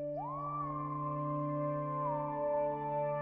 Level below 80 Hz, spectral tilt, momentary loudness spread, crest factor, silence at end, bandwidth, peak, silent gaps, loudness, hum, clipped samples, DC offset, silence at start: -64 dBFS; -9.5 dB/octave; 4 LU; 12 dB; 0 s; 3.7 kHz; -24 dBFS; none; -37 LUFS; none; under 0.1%; under 0.1%; 0 s